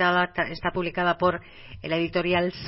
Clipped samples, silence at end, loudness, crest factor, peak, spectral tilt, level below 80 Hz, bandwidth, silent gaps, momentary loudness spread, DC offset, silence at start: under 0.1%; 0 s; -25 LUFS; 18 dB; -8 dBFS; -9 dB/octave; -50 dBFS; 5.8 kHz; none; 11 LU; under 0.1%; 0 s